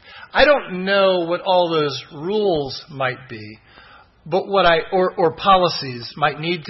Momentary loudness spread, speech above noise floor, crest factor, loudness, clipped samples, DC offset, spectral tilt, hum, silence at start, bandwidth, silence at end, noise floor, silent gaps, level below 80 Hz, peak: 13 LU; 28 dB; 18 dB; -18 LUFS; under 0.1%; under 0.1%; -6 dB/octave; none; 0.1 s; 6 kHz; 0 s; -47 dBFS; none; -46 dBFS; -2 dBFS